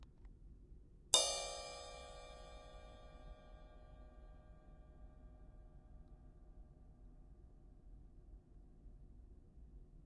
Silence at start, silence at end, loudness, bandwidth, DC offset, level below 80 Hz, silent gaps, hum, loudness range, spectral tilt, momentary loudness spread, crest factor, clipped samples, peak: 0 s; 0 s; -38 LUFS; 11.5 kHz; under 0.1%; -60 dBFS; none; none; 23 LU; -0.5 dB/octave; 22 LU; 38 dB; under 0.1%; -12 dBFS